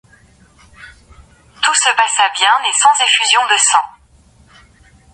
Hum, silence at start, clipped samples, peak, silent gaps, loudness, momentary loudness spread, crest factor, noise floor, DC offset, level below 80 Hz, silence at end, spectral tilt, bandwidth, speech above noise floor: none; 0.8 s; under 0.1%; 0 dBFS; none; -11 LUFS; 5 LU; 16 dB; -48 dBFS; under 0.1%; -52 dBFS; 1.25 s; 3 dB/octave; 11.5 kHz; 36 dB